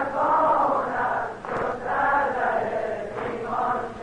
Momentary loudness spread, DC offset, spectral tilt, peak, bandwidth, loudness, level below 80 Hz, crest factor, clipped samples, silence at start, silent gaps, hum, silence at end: 9 LU; under 0.1%; -6 dB/octave; -12 dBFS; 10 kHz; -24 LUFS; -52 dBFS; 12 dB; under 0.1%; 0 s; none; none; 0 s